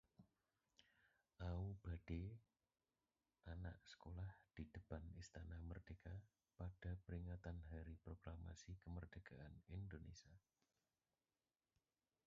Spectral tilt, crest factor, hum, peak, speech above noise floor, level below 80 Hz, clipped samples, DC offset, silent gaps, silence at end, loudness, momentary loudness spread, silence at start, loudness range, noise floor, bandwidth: -7 dB/octave; 20 dB; none; -38 dBFS; over 35 dB; -62 dBFS; under 0.1%; under 0.1%; none; 1.9 s; -56 LUFS; 8 LU; 0.2 s; 4 LU; under -90 dBFS; 7.2 kHz